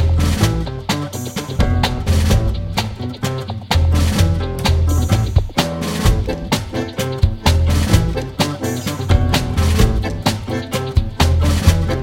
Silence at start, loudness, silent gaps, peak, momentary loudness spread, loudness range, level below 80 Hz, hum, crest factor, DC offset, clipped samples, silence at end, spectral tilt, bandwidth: 0 s; -18 LUFS; none; 0 dBFS; 7 LU; 1 LU; -22 dBFS; none; 16 dB; under 0.1%; under 0.1%; 0 s; -5.5 dB/octave; 16.5 kHz